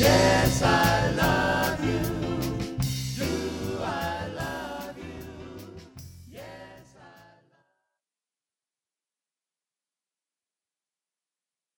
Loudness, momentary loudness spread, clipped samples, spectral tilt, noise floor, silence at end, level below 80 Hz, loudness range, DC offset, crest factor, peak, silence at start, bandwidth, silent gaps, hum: -26 LUFS; 23 LU; under 0.1%; -5 dB/octave; under -90 dBFS; 4.7 s; -44 dBFS; 24 LU; under 0.1%; 22 dB; -6 dBFS; 0 s; 19.5 kHz; none; none